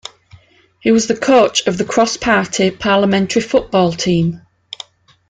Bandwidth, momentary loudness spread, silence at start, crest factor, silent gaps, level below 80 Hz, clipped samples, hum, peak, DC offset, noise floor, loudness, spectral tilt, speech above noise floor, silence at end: 9.4 kHz; 19 LU; 0.85 s; 14 dB; none; -48 dBFS; under 0.1%; none; -2 dBFS; under 0.1%; -46 dBFS; -14 LUFS; -4.5 dB/octave; 32 dB; 0.9 s